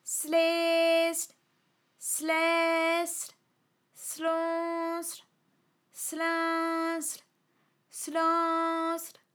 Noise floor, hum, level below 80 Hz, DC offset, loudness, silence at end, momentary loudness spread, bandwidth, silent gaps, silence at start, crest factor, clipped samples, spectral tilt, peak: -74 dBFS; none; under -90 dBFS; under 0.1%; -29 LUFS; 0.25 s; 14 LU; over 20 kHz; none; 0.05 s; 16 dB; under 0.1%; 0 dB/octave; -16 dBFS